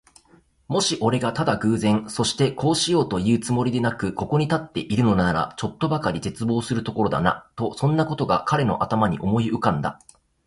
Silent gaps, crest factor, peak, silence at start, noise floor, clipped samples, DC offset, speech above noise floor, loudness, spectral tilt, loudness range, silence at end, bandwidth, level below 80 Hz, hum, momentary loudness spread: none; 18 dB; -4 dBFS; 0.7 s; -57 dBFS; under 0.1%; under 0.1%; 35 dB; -23 LUFS; -5.5 dB/octave; 2 LU; 0.5 s; 11.5 kHz; -48 dBFS; none; 6 LU